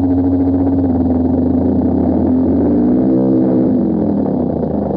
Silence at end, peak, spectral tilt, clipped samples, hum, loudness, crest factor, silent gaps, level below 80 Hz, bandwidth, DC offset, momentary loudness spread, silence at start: 0 s; -2 dBFS; -13.5 dB/octave; under 0.1%; none; -14 LUFS; 10 dB; none; -32 dBFS; 2.2 kHz; under 0.1%; 3 LU; 0 s